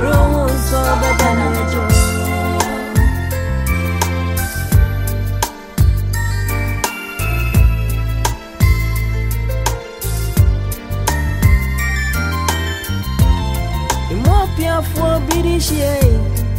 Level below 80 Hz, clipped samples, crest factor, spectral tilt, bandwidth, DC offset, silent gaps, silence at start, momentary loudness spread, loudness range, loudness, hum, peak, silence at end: -20 dBFS; under 0.1%; 14 dB; -5.5 dB/octave; 16.5 kHz; under 0.1%; none; 0 s; 6 LU; 2 LU; -17 LUFS; none; 0 dBFS; 0 s